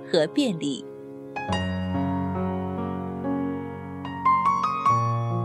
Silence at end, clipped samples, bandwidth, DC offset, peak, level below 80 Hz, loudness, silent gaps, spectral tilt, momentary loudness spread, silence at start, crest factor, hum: 0 s; under 0.1%; 11 kHz; under 0.1%; -8 dBFS; -56 dBFS; -26 LUFS; none; -6.5 dB/octave; 13 LU; 0 s; 18 dB; none